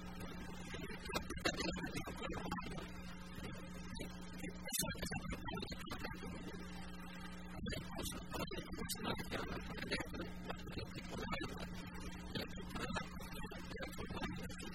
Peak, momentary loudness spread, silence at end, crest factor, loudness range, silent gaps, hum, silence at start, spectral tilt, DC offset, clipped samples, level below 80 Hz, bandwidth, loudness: -22 dBFS; 8 LU; 0 s; 24 dB; 2 LU; none; none; 0 s; -4 dB/octave; 0.2%; under 0.1%; -54 dBFS; 16 kHz; -46 LUFS